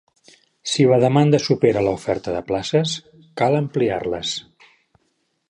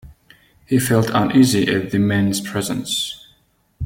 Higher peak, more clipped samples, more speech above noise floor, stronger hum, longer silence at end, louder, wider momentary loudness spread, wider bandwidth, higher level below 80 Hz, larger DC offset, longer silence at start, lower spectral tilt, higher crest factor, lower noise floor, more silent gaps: about the same, -2 dBFS vs -2 dBFS; neither; first, 50 dB vs 42 dB; neither; first, 1.1 s vs 0 s; about the same, -20 LUFS vs -18 LUFS; about the same, 11 LU vs 9 LU; second, 11 kHz vs 16.5 kHz; about the same, -52 dBFS vs -48 dBFS; neither; first, 0.65 s vs 0.05 s; about the same, -5.5 dB/octave vs -5 dB/octave; about the same, 18 dB vs 16 dB; first, -69 dBFS vs -59 dBFS; neither